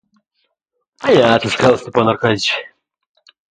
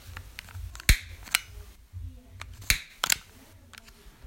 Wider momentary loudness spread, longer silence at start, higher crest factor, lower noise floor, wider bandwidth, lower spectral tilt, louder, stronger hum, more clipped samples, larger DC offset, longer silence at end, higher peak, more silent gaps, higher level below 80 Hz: second, 8 LU vs 24 LU; first, 1 s vs 0 s; second, 16 dB vs 32 dB; first, -73 dBFS vs -53 dBFS; second, 9.6 kHz vs 16.5 kHz; first, -5 dB/octave vs -1.5 dB/octave; first, -14 LUFS vs -27 LUFS; neither; neither; neither; first, 0.85 s vs 0.15 s; about the same, 0 dBFS vs 0 dBFS; neither; second, -50 dBFS vs -36 dBFS